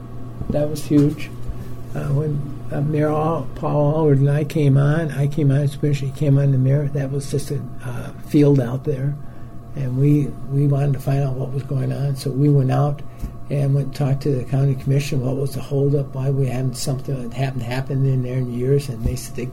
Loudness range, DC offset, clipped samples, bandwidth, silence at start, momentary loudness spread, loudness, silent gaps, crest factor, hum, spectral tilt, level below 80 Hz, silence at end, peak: 4 LU; under 0.1%; under 0.1%; 13.5 kHz; 0 s; 12 LU; -20 LUFS; none; 14 dB; none; -8 dB/octave; -38 dBFS; 0 s; -4 dBFS